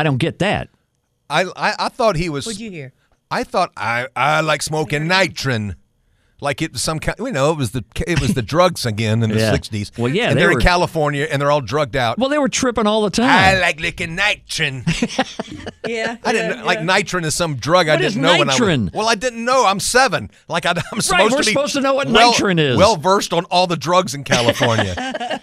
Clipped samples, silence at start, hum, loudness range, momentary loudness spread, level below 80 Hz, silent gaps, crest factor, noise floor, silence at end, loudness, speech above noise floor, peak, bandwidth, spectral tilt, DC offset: under 0.1%; 0 s; none; 5 LU; 10 LU; -38 dBFS; none; 18 dB; -66 dBFS; 0.05 s; -17 LUFS; 49 dB; 0 dBFS; 15.5 kHz; -4 dB/octave; under 0.1%